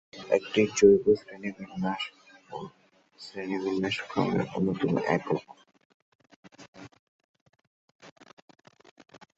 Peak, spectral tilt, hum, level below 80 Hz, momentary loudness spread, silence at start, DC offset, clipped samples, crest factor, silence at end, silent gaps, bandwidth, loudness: -8 dBFS; -5.5 dB/octave; none; -64 dBFS; 22 LU; 0.15 s; under 0.1%; under 0.1%; 22 dB; 1.3 s; 5.85-6.19 s, 6.36-6.43 s, 6.68-6.73 s, 6.99-7.34 s, 7.41-7.46 s, 7.67-7.99 s; 8 kHz; -27 LUFS